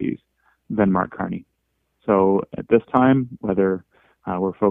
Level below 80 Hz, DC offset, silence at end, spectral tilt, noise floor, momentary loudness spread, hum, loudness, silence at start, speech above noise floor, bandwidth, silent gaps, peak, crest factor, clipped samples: -54 dBFS; under 0.1%; 0 s; -11 dB/octave; -72 dBFS; 14 LU; none; -21 LUFS; 0 s; 53 dB; 3.7 kHz; none; -2 dBFS; 20 dB; under 0.1%